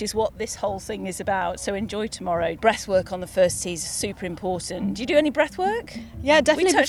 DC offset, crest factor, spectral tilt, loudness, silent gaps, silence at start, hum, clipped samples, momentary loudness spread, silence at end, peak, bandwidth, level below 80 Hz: under 0.1%; 20 dB; -3.5 dB/octave; -24 LUFS; none; 0 s; none; under 0.1%; 10 LU; 0 s; -4 dBFS; 15.5 kHz; -48 dBFS